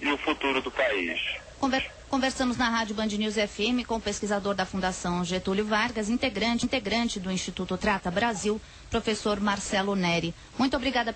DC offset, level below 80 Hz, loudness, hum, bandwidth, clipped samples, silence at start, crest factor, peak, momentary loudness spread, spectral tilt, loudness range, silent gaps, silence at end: under 0.1%; -48 dBFS; -28 LUFS; none; 8.8 kHz; under 0.1%; 0 s; 14 dB; -14 dBFS; 5 LU; -4 dB/octave; 1 LU; none; 0 s